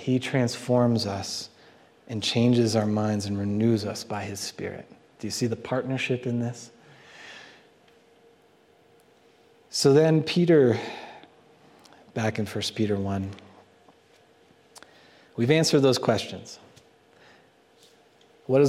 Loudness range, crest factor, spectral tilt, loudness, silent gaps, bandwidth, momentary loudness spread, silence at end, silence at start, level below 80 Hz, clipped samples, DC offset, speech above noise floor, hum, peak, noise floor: 8 LU; 20 dB; -5.5 dB/octave; -25 LUFS; none; 15.5 kHz; 23 LU; 0 s; 0 s; -68 dBFS; under 0.1%; under 0.1%; 35 dB; none; -6 dBFS; -59 dBFS